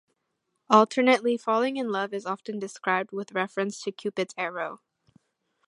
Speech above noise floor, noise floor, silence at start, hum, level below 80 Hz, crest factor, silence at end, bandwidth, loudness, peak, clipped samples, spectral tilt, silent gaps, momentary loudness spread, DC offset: 52 dB; -78 dBFS; 0.7 s; none; -82 dBFS; 24 dB; 0.9 s; 11.5 kHz; -26 LUFS; -4 dBFS; under 0.1%; -4.5 dB/octave; none; 12 LU; under 0.1%